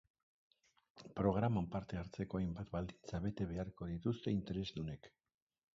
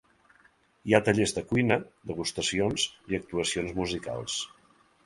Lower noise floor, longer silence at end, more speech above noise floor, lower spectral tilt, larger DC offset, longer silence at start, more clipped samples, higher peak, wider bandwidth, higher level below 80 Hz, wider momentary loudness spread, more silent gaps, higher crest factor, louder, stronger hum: first, -69 dBFS vs -63 dBFS; about the same, 0.65 s vs 0.6 s; second, 28 dB vs 35 dB; first, -7.5 dB/octave vs -4 dB/octave; neither; about the same, 0.95 s vs 0.85 s; neither; second, -22 dBFS vs -4 dBFS; second, 7.4 kHz vs 11.5 kHz; about the same, -58 dBFS vs -54 dBFS; about the same, 10 LU vs 9 LU; neither; second, 20 dB vs 26 dB; second, -42 LUFS vs -28 LUFS; neither